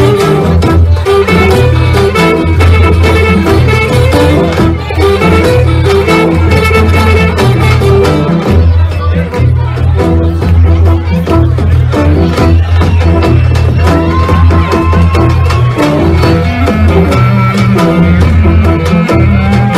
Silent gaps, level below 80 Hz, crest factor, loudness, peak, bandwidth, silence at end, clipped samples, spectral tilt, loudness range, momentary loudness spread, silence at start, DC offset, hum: none; -16 dBFS; 6 dB; -7 LUFS; 0 dBFS; 13 kHz; 0 s; 0.3%; -7.5 dB/octave; 2 LU; 3 LU; 0 s; under 0.1%; none